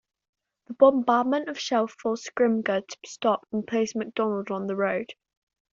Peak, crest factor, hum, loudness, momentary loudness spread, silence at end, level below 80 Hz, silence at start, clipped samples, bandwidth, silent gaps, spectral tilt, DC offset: -4 dBFS; 22 dB; none; -25 LUFS; 10 LU; 0.6 s; -72 dBFS; 0.7 s; under 0.1%; 7.6 kHz; none; -4 dB/octave; under 0.1%